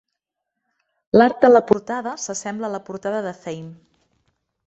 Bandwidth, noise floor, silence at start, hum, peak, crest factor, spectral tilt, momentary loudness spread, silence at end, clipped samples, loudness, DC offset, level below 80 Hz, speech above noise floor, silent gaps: 8.2 kHz; -81 dBFS; 1.15 s; none; -2 dBFS; 20 dB; -5 dB/octave; 19 LU; 0.95 s; under 0.1%; -19 LUFS; under 0.1%; -62 dBFS; 62 dB; none